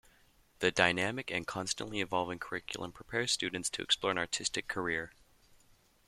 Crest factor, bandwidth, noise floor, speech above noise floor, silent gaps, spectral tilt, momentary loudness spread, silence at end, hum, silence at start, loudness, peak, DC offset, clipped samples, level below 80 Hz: 28 dB; 15 kHz; -66 dBFS; 31 dB; none; -2.5 dB/octave; 11 LU; 1 s; none; 0.6 s; -33 LUFS; -8 dBFS; under 0.1%; under 0.1%; -64 dBFS